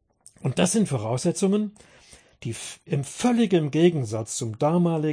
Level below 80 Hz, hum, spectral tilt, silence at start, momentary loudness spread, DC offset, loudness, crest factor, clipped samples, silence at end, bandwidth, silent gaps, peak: -62 dBFS; none; -5.5 dB/octave; 0.4 s; 12 LU; under 0.1%; -24 LUFS; 16 dB; under 0.1%; 0 s; 10.5 kHz; none; -8 dBFS